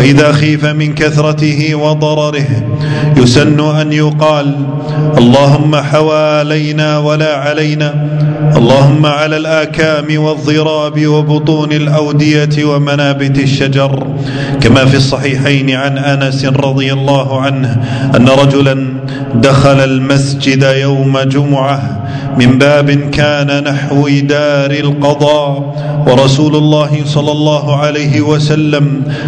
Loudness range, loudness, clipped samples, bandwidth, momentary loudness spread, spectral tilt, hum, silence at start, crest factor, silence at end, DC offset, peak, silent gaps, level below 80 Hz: 1 LU; -9 LUFS; 2%; 9.4 kHz; 6 LU; -6.5 dB/octave; none; 0 s; 8 dB; 0 s; under 0.1%; 0 dBFS; none; -38 dBFS